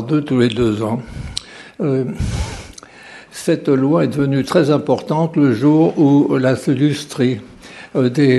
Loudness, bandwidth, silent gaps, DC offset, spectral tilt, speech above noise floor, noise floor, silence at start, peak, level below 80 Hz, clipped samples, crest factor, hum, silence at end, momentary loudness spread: -16 LUFS; 12.5 kHz; none; under 0.1%; -7 dB/octave; 24 dB; -39 dBFS; 0 s; 0 dBFS; -38 dBFS; under 0.1%; 16 dB; none; 0 s; 14 LU